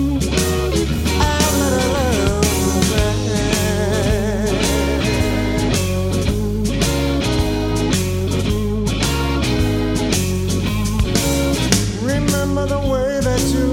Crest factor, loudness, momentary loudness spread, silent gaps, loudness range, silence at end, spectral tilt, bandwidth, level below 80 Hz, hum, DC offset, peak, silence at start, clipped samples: 16 dB; -18 LUFS; 3 LU; none; 2 LU; 0 s; -5 dB/octave; 17 kHz; -24 dBFS; none; under 0.1%; -2 dBFS; 0 s; under 0.1%